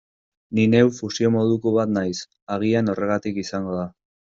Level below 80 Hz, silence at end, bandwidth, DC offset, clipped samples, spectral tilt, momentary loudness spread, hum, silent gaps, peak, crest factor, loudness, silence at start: -60 dBFS; 0.45 s; 7.6 kHz; under 0.1%; under 0.1%; -6.5 dB/octave; 11 LU; none; 2.42-2.47 s; -4 dBFS; 18 dB; -22 LUFS; 0.5 s